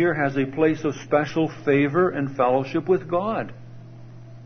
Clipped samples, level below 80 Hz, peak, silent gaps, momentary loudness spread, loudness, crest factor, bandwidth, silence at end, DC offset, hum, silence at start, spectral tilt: under 0.1%; -56 dBFS; -6 dBFS; none; 8 LU; -23 LUFS; 16 dB; 6.6 kHz; 0 s; under 0.1%; none; 0 s; -7.5 dB/octave